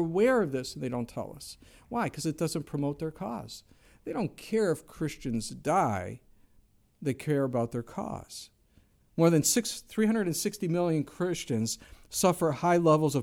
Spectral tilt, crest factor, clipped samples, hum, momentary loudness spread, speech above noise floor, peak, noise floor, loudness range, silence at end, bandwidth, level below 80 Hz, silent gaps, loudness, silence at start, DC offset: -5 dB/octave; 20 dB; under 0.1%; none; 15 LU; 35 dB; -10 dBFS; -64 dBFS; 7 LU; 0 s; 17 kHz; -58 dBFS; none; -30 LUFS; 0 s; under 0.1%